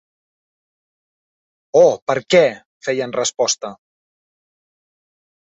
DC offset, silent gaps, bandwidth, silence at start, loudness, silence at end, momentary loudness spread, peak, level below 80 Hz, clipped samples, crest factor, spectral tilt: under 0.1%; 2.02-2.07 s, 2.65-2.81 s; 8.2 kHz; 1.75 s; -17 LUFS; 1.7 s; 10 LU; -2 dBFS; -64 dBFS; under 0.1%; 20 dB; -3 dB/octave